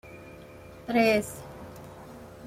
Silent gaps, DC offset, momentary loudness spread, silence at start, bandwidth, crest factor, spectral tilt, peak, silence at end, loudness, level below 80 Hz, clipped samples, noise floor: none; under 0.1%; 24 LU; 0.05 s; 16 kHz; 20 dB; -5 dB/octave; -10 dBFS; 0 s; -26 LUFS; -58 dBFS; under 0.1%; -47 dBFS